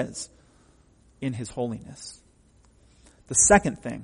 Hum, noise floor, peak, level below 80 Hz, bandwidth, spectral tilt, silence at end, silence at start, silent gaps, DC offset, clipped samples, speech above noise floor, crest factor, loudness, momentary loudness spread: none; -59 dBFS; -4 dBFS; -48 dBFS; 10.5 kHz; -3.5 dB/octave; 0 s; 0 s; none; under 0.1%; under 0.1%; 34 dB; 24 dB; -23 LUFS; 24 LU